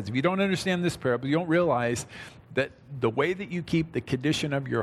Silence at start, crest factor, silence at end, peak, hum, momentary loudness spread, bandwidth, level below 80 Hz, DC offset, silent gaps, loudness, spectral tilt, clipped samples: 0 s; 16 dB; 0 s; -12 dBFS; none; 8 LU; 14 kHz; -58 dBFS; under 0.1%; none; -27 LUFS; -5.5 dB/octave; under 0.1%